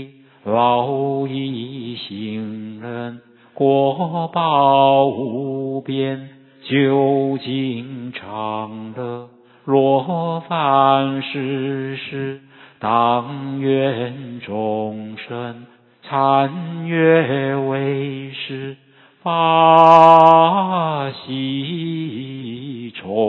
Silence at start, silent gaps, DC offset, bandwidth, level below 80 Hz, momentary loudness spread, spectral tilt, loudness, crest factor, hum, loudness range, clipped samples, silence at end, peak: 0 s; none; under 0.1%; 8 kHz; -66 dBFS; 17 LU; -8 dB/octave; -17 LUFS; 18 dB; none; 9 LU; under 0.1%; 0 s; 0 dBFS